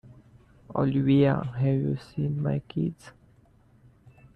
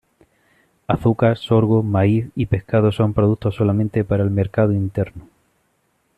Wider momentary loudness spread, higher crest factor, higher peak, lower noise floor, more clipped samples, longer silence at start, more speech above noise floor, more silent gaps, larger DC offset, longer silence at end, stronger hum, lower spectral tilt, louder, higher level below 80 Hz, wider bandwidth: first, 10 LU vs 7 LU; about the same, 16 dB vs 16 dB; second, -12 dBFS vs -2 dBFS; second, -59 dBFS vs -66 dBFS; neither; second, 0.05 s vs 0.9 s; second, 34 dB vs 48 dB; neither; neither; first, 1.25 s vs 0.95 s; neither; about the same, -9.5 dB/octave vs -9.5 dB/octave; second, -26 LUFS vs -19 LUFS; second, -56 dBFS vs -44 dBFS; first, 5.8 kHz vs 4.5 kHz